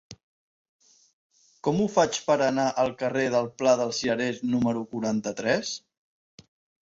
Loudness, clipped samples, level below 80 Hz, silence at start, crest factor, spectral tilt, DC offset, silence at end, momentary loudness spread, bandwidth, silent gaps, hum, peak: -26 LUFS; under 0.1%; -64 dBFS; 0.1 s; 20 dB; -4.5 dB/octave; under 0.1%; 1.05 s; 6 LU; 8 kHz; 0.23-0.79 s, 1.13-1.30 s; none; -8 dBFS